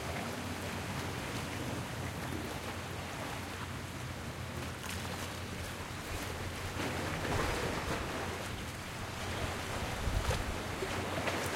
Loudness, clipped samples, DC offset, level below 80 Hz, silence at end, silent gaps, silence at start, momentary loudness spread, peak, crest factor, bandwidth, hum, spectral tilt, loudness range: -38 LUFS; under 0.1%; under 0.1%; -48 dBFS; 0 s; none; 0 s; 6 LU; -20 dBFS; 18 dB; 16.5 kHz; none; -4.5 dB/octave; 3 LU